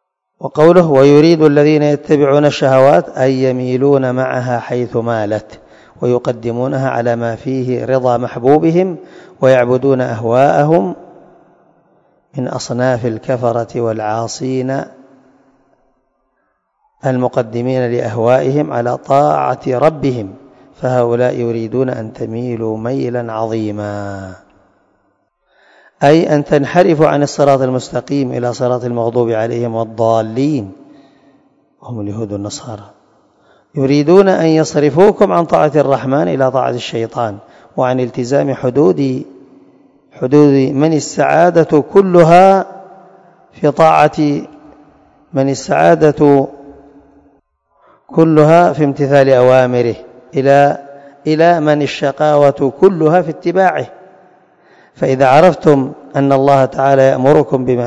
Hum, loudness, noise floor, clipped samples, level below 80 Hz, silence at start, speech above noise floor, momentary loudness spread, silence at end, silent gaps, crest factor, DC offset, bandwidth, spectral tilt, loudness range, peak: none; -12 LUFS; -64 dBFS; 0.7%; -52 dBFS; 0.4 s; 52 dB; 13 LU; 0 s; none; 12 dB; under 0.1%; 10.5 kHz; -7 dB/octave; 9 LU; 0 dBFS